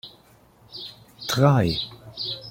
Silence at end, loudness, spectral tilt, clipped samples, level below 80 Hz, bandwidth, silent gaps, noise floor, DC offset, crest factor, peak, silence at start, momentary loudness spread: 0 s; -23 LUFS; -6 dB/octave; under 0.1%; -52 dBFS; 16.5 kHz; none; -55 dBFS; under 0.1%; 22 dB; -4 dBFS; 0.05 s; 21 LU